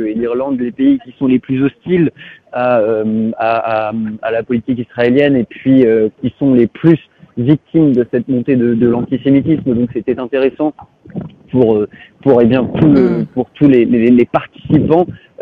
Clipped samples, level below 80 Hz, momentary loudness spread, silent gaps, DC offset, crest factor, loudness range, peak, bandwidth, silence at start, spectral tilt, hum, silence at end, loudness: 0.2%; -46 dBFS; 9 LU; none; under 0.1%; 12 dB; 4 LU; 0 dBFS; 4.9 kHz; 0 s; -10.5 dB/octave; none; 0 s; -13 LUFS